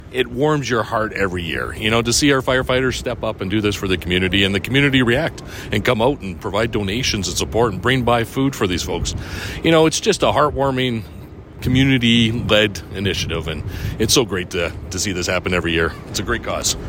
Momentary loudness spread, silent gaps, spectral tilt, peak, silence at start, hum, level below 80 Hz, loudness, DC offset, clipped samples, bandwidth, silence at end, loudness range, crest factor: 9 LU; none; -4 dB/octave; 0 dBFS; 0 s; none; -36 dBFS; -18 LUFS; under 0.1%; under 0.1%; 16.5 kHz; 0 s; 2 LU; 18 dB